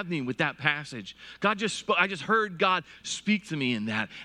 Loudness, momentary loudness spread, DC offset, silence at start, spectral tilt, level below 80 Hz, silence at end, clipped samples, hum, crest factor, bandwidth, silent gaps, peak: -27 LUFS; 8 LU; under 0.1%; 0 s; -4 dB/octave; -68 dBFS; 0 s; under 0.1%; none; 22 dB; 11 kHz; none; -6 dBFS